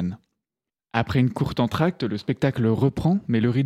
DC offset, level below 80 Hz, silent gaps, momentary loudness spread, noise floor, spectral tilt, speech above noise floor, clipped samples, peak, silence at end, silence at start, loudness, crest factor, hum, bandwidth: under 0.1%; -48 dBFS; none; 7 LU; -89 dBFS; -8 dB/octave; 68 dB; under 0.1%; -4 dBFS; 0 s; 0 s; -23 LUFS; 18 dB; none; 13.5 kHz